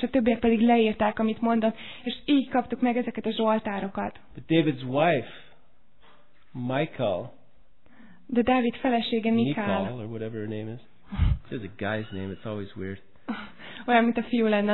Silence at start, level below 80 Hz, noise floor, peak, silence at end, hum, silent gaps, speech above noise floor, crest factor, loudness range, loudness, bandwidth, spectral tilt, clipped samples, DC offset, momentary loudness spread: 0 s; -42 dBFS; -64 dBFS; -8 dBFS; 0 s; none; none; 38 dB; 18 dB; 8 LU; -26 LUFS; 4.3 kHz; -10 dB/octave; under 0.1%; 0.5%; 15 LU